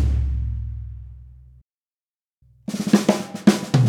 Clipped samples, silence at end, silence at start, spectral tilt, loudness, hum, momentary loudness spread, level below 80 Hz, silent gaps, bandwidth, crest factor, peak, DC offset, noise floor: under 0.1%; 0 s; 0 s; -6.5 dB/octave; -21 LUFS; none; 19 LU; -30 dBFS; 1.62-1.67 s, 1.77-1.83 s, 1.92-2.09 s, 2.22-2.30 s; 16.5 kHz; 22 dB; 0 dBFS; under 0.1%; under -90 dBFS